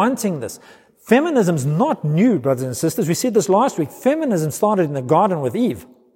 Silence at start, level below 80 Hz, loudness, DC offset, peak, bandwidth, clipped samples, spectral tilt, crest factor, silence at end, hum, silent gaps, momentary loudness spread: 0 s; -62 dBFS; -18 LUFS; under 0.1%; -2 dBFS; 16.5 kHz; under 0.1%; -6 dB/octave; 16 dB; 0.3 s; none; none; 6 LU